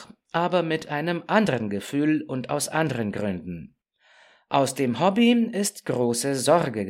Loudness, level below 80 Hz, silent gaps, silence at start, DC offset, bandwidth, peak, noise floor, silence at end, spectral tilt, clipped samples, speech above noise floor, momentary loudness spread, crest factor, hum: -24 LUFS; -64 dBFS; none; 0 s; under 0.1%; 16 kHz; -6 dBFS; -59 dBFS; 0 s; -5 dB/octave; under 0.1%; 35 dB; 9 LU; 18 dB; none